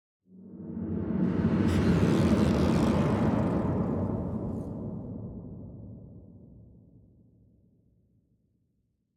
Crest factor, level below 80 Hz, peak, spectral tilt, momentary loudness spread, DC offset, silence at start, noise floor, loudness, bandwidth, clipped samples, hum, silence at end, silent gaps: 18 dB; -46 dBFS; -12 dBFS; -8 dB/octave; 20 LU; under 0.1%; 0.35 s; -75 dBFS; -28 LUFS; 12.5 kHz; under 0.1%; none; 2.7 s; none